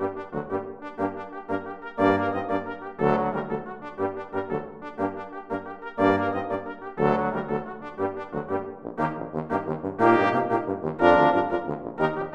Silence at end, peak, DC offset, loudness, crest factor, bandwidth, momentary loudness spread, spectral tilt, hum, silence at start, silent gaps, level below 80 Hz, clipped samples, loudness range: 0 s; -4 dBFS; under 0.1%; -26 LUFS; 22 dB; 8.4 kHz; 13 LU; -8 dB/octave; none; 0 s; none; -58 dBFS; under 0.1%; 6 LU